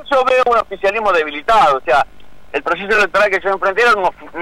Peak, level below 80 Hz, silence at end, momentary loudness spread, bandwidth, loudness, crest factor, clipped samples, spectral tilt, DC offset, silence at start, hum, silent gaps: -6 dBFS; -44 dBFS; 0 s; 7 LU; 15 kHz; -14 LUFS; 10 dB; under 0.1%; -3.5 dB/octave; under 0.1%; 0 s; none; none